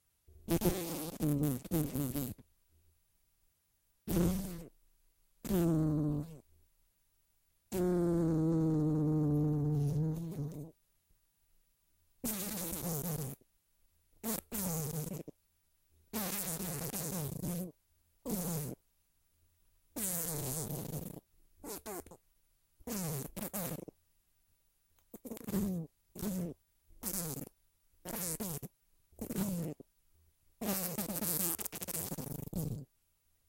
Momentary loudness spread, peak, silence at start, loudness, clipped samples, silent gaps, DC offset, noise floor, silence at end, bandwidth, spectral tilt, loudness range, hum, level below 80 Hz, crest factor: 17 LU; -12 dBFS; 0.3 s; -37 LUFS; under 0.1%; none; under 0.1%; -76 dBFS; 0.65 s; 17 kHz; -5.5 dB/octave; 8 LU; none; -56 dBFS; 26 dB